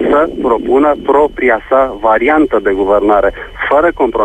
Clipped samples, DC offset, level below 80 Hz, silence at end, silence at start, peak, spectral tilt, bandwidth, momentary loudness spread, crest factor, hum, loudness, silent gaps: under 0.1%; under 0.1%; -34 dBFS; 0 s; 0 s; 0 dBFS; -7 dB/octave; 9 kHz; 3 LU; 10 dB; none; -11 LUFS; none